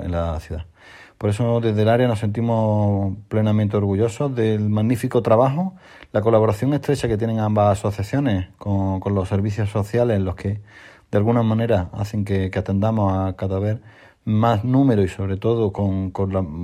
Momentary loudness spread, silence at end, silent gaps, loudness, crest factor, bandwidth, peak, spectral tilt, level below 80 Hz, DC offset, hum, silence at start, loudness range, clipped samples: 8 LU; 0 s; none; -21 LUFS; 18 dB; 12 kHz; -2 dBFS; -8 dB/octave; -48 dBFS; under 0.1%; none; 0 s; 2 LU; under 0.1%